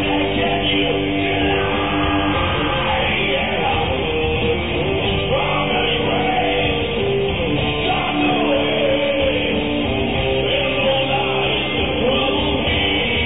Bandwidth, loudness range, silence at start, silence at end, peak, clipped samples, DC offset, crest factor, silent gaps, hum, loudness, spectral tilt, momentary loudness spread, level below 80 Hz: 4 kHz; 1 LU; 0 s; 0 s; -6 dBFS; under 0.1%; 1%; 12 dB; none; none; -18 LUFS; -9 dB/octave; 2 LU; -32 dBFS